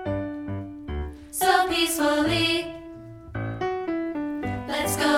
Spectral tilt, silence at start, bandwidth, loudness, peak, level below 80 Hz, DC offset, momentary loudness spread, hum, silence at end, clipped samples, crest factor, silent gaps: -4 dB/octave; 0 s; 17.5 kHz; -25 LUFS; -6 dBFS; -44 dBFS; under 0.1%; 14 LU; none; 0 s; under 0.1%; 20 dB; none